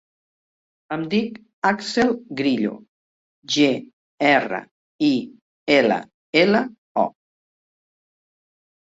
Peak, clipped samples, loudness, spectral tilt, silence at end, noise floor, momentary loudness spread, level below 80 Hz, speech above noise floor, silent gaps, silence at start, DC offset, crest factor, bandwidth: -2 dBFS; under 0.1%; -21 LUFS; -4.5 dB/octave; 1.75 s; under -90 dBFS; 12 LU; -64 dBFS; over 70 dB; 1.53-1.62 s, 2.88-3.42 s, 3.93-4.18 s, 4.71-4.99 s, 5.41-5.67 s, 6.14-6.33 s, 6.78-6.95 s; 0.9 s; under 0.1%; 20 dB; 8 kHz